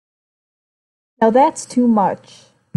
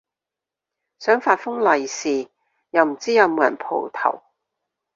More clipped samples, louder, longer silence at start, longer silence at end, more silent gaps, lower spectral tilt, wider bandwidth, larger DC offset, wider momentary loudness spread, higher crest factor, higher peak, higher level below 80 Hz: neither; first, -16 LUFS vs -20 LUFS; first, 1.2 s vs 1 s; second, 0.6 s vs 0.75 s; neither; first, -6 dB/octave vs -3 dB/octave; first, 11.5 kHz vs 7.6 kHz; neither; about the same, 7 LU vs 9 LU; about the same, 16 dB vs 20 dB; about the same, -2 dBFS vs -2 dBFS; first, -66 dBFS vs -72 dBFS